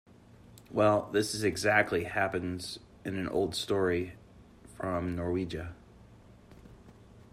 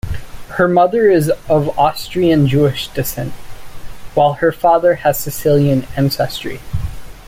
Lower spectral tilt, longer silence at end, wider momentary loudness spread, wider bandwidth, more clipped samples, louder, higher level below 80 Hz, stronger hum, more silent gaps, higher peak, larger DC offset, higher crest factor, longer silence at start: about the same, -5 dB/octave vs -6 dB/octave; first, 0.15 s vs 0 s; about the same, 14 LU vs 13 LU; about the same, 15 kHz vs 16.5 kHz; neither; second, -31 LUFS vs -15 LUFS; second, -58 dBFS vs -34 dBFS; neither; neither; second, -10 dBFS vs -2 dBFS; neither; first, 22 dB vs 14 dB; first, 0.5 s vs 0.05 s